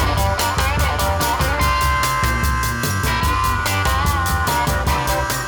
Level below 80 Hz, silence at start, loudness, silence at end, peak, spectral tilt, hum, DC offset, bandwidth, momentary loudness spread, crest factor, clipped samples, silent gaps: -24 dBFS; 0 s; -18 LUFS; 0 s; -6 dBFS; -4 dB/octave; none; under 0.1%; over 20 kHz; 2 LU; 12 dB; under 0.1%; none